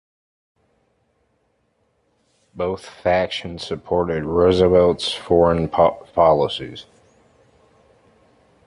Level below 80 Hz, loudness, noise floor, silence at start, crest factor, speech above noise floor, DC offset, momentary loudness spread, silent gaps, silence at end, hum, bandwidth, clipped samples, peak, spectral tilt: -42 dBFS; -19 LUFS; -66 dBFS; 2.55 s; 18 dB; 48 dB; under 0.1%; 13 LU; none; 1.85 s; none; 11.5 kHz; under 0.1%; -2 dBFS; -6 dB/octave